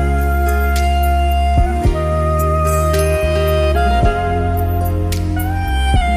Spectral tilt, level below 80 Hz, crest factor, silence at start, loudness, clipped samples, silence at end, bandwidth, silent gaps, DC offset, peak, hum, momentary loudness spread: -6.5 dB/octave; -18 dBFS; 12 dB; 0 s; -16 LUFS; under 0.1%; 0 s; 15.5 kHz; none; under 0.1%; -2 dBFS; none; 4 LU